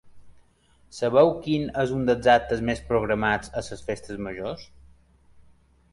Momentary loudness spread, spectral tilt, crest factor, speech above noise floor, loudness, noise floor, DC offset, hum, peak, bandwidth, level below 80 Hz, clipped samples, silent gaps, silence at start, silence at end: 14 LU; -6 dB/octave; 20 dB; 36 dB; -24 LUFS; -59 dBFS; under 0.1%; none; -6 dBFS; 11.5 kHz; -48 dBFS; under 0.1%; none; 0.05 s; 1.3 s